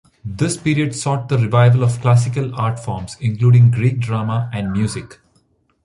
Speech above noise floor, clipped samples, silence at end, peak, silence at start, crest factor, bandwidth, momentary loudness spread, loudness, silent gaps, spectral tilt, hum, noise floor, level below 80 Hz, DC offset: 44 dB; under 0.1%; 0.7 s; -2 dBFS; 0.25 s; 14 dB; 11.5 kHz; 11 LU; -17 LUFS; none; -6.5 dB/octave; none; -60 dBFS; -46 dBFS; under 0.1%